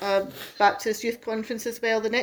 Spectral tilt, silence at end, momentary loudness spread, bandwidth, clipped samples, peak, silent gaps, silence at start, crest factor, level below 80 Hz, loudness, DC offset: -3 dB/octave; 0 s; 9 LU; over 20 kHz; under 0.1%; -8 dBFS; none; 0 s; 18 dB; -64 dBFS; -26 LUFS; under 0.1%